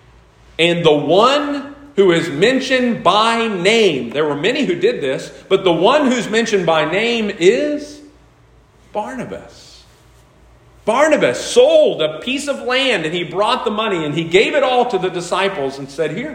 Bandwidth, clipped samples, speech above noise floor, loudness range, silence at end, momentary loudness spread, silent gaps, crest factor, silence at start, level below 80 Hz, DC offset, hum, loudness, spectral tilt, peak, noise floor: 15.5 kHz; under 0.1%; 34 dB; 6 LU; 0 s; 12 LU; none; 16 dB; 0.6 s; -52 dBFS; under 0.1%; none; -15 LUFS; -4.5 dB/octave; 0 dBFS; -49 dBFS